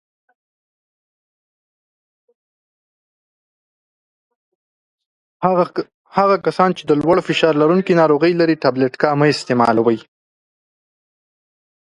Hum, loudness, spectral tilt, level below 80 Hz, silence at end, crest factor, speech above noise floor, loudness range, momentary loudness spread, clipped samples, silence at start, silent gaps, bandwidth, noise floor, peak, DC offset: none; -16 LUFS; -6.5 dB/octave; -60 dBFS; 1.9 s; 20 dB; over 75 dB; 10 LU; 6 LU; under 0.1%; 5.4 s; 5.94-6.05 s; 11.5 kHz; under -90 dBFS; 0 dBFS; under 0.1%